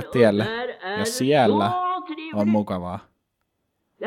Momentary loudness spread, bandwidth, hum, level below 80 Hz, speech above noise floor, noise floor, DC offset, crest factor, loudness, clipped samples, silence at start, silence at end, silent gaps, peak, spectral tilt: 12 LU; 16 kHz; none; -64 dBFS; 55 dB; -75 dBFS; under 0.1%; 20 dB; -22 LUFS; under 0.1%; 0 s; 0 s; none; -4 dBFS; -5.5 dB/octave